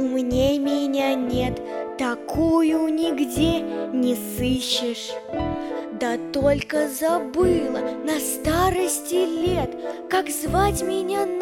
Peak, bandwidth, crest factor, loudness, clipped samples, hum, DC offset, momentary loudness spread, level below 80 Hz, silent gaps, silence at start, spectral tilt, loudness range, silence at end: -8 dBFS; 18 kHz; 14 dB; -23 LUFS; under 0.1%; none; under 0.1%; 7 LU; -40 dBFS; none; 0 s; -4.5 dB/octave; 2 LU; 0 s